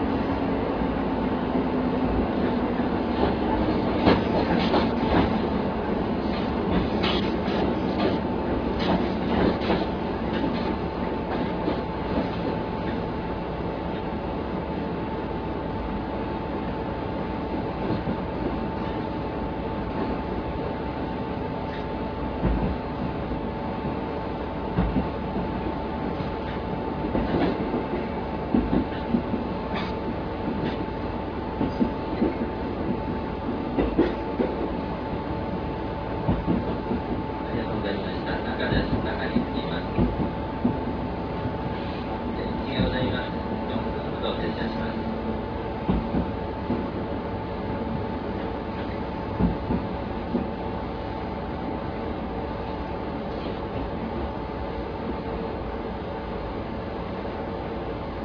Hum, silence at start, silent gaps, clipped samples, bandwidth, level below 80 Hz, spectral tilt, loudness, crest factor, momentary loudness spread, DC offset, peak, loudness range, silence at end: none; 0 s; none; under 0.1%; 5.4 kHz; -38 dBFS; -9 dB/octave; -28 LUFS; 20 dB; 7 LU; under 0.1%; -6 dBFS; 6 LU; 0 s